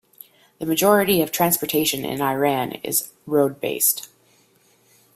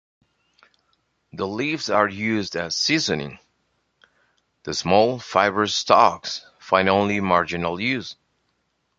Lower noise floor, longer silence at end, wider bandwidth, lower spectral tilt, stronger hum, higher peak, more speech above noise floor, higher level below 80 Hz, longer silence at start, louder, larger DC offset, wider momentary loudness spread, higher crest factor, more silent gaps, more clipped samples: second, -59 dBFS vs -71 dBFS; first, 1.1 s vs 0.85 s; first, 16 kHz vs 9.2 kHz; about the same, -3.5 dB/octave vs -4 dB/octave; neither; about the same, -2 dBFS vs -2 dBFS; second, 38 dB vs 50 dB; second, -60 dBFS vs -54 dBFS; second, 0.6 s vs 1.35 s; about the same, -20 LUFS vs -21 LUFS; neither; second, 7 LU vs 13 LU; about the same, 20 dB vs 22 dB; neither; neither